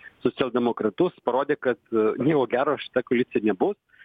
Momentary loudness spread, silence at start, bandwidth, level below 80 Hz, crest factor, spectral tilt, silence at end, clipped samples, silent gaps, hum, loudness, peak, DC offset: 4 LU; 0.05 s; 4.8 kHz; -64 dBFS; 16 dB; -9 dB/octave; 0.3 s; under 0.1%; none; none; -24 LUFS; -8 dBFS; under 0.1%